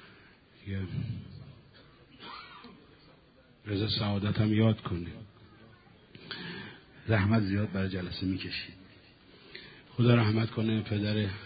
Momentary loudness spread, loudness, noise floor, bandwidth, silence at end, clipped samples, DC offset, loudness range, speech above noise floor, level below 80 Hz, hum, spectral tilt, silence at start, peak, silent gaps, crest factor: 23 LU; -31 LUFS; -60 dBFS; 5 kHz; 0 s; under 0.1%; under 0.1%; 10 LU; 31 dB; -52 dBFS; none; -10.5 dB/octave; 0 s; -10 dBFS; none; 22 dB